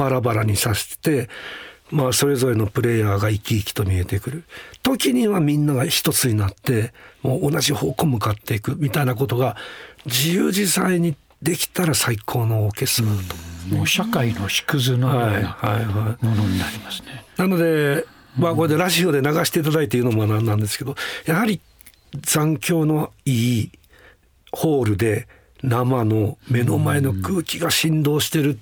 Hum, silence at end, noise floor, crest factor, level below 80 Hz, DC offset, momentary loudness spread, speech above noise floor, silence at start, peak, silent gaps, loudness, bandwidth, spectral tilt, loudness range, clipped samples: none; 0 s; -52 dBFS; 16 dB; -52 dBFS; under 0.1%; 9 LU; 32 dB; 0 s; -4 dBFS; none; -20 LUFS; over 20 kHz; -5 dB/octave; 2 LU; under 0.1%